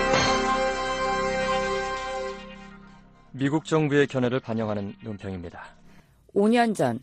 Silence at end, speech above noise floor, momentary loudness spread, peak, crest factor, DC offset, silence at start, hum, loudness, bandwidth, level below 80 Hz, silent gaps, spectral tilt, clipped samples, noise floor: 0 s; 28 dB; 19 LU; -8 dBFS; 18 dB; under 0.1%; 0 s; none; -25 LUFS; 13 kHz; -46 dBFS; none; -5 dB/octave; under 0.1%; -53 dBFS